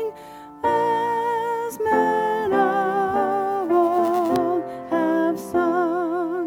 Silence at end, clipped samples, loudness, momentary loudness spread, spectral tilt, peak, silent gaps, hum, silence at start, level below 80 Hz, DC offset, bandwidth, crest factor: 0 s; under 0.1%; -22 LUFS; 6 LU; -6 dB/octave; -8 dBFS; none; none; 0 s; -60 dBFS; under 0.1%; 17.5 kHz; 14 dB